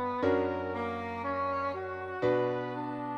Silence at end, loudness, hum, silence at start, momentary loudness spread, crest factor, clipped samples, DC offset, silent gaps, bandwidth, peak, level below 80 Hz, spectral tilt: 0 s; -32 LUFS; none; 0 s; 7 LU; 16 dB; under 0.1%; under 0.1%; none; 7.2 kHz; -16 dBFS; -64 dBFS; -8 dB/octave